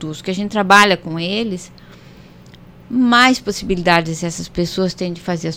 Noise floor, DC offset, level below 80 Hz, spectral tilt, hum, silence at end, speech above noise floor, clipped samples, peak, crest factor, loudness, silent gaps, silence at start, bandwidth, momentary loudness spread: -41 dBFS; under 0.1%; -44 dBFS; -4.5 dB/octave; 60 Hz at -40 dBFS; 0 s; 25 dB; under 0.1%; 0 dBFS; 18 dB; -16 LUFS; none; 0 s; 16.5 kHz; 13 LU